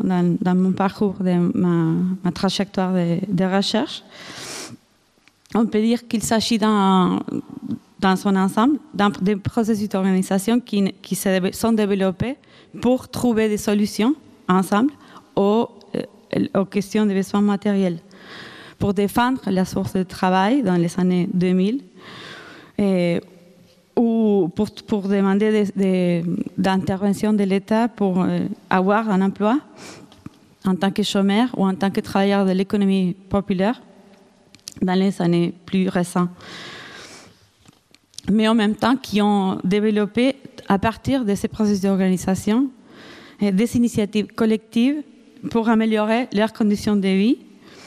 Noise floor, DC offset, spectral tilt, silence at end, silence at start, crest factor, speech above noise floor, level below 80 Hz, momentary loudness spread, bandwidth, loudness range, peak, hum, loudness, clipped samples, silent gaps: -59 dBFS; under 0.1%; -6.5 dB/octave; 0.05 s; 0 s; 18 dB; 40 dB; -52 dBFS; 12 LU; 15 kHz; 3 LU; -2 dBFS; none; -20 LUFS; under 0.1%; none